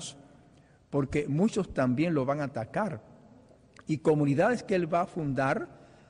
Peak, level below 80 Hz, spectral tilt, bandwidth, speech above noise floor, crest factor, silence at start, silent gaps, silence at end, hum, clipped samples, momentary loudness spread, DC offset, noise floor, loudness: -14 dBFS; -58 dBFS; -7 dB/octave; 10.5 kHz; 31 dB; 16 dB; 0 s; none; 0.25 s; none; under 0.1%; 9 LU; under 0.1%; -59 dBFS; -29 LUFS